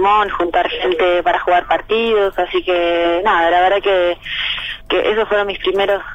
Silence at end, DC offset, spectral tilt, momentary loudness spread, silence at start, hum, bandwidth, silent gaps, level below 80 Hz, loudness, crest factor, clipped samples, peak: 0 s; under 0.1%; -5 dB/octave; 5 LU; 0 s; none; 14 kHz; none; -40 dBFS; -15 LUFS; 12 dB; under 0.1%; -4 dBFS